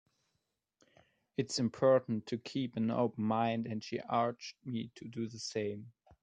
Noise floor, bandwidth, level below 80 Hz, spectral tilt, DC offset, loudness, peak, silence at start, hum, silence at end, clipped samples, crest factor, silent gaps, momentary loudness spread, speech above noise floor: -84 dBFS; 9.6 kHz; -76 dBFS; -5.5 dB/octave; under 0.1%; -35 LUFS; -16 dBFS; 1.4 s; none; 0.35 s; under 0.1%; 20 dB; none; 12 LU; 50 dB